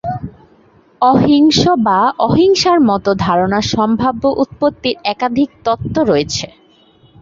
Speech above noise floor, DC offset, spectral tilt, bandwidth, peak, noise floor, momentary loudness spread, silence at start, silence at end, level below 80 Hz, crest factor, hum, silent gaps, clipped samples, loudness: 36 dB; under 0.1%; -5.5 dB/octave; 7.8 kHz; 0 dBFS; -49 dBFS; 9 LU; 0.05 s; 0.75 s; -42 dBFS; 12 dB; none; none; under 0.1%; -13 LUFS